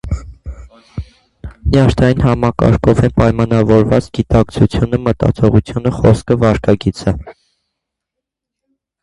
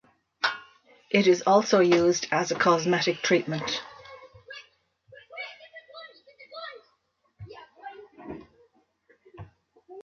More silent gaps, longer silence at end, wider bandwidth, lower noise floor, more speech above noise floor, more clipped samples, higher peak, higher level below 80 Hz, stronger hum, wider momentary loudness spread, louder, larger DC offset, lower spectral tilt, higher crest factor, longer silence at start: neither; first, 1.7 s vs 0 s; first, 11 kHz vs 7.2 kHz; first, -80 dBFS vs -72 dBFS; first, 68 dB vs 49 dB; neither; first, 0 dBFS vs -6 dBFS; first, -28 dBFS vs -66 dBFS; neither; second, 15 LU vs 25 LU; first, -13 LUFS vs -24 LUFS; neither; first, -8 dB/octave vs -4.5 dB/octave; second, 14 dB vs 22 dB; second, 0.05 s vs 0.45 s